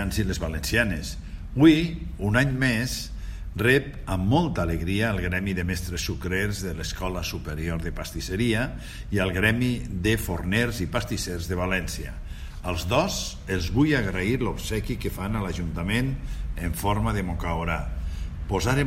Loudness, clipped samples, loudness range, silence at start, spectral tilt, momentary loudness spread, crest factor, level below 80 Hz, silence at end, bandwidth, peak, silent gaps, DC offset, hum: -26 LUFS; under 0.1%; 5 LU; 0 s; -5.5 dB/octave; 11 LU; 20 dB; -36 dBFS; 0 s; 16 kHz; -4 dBFS; none; under 0.1%; none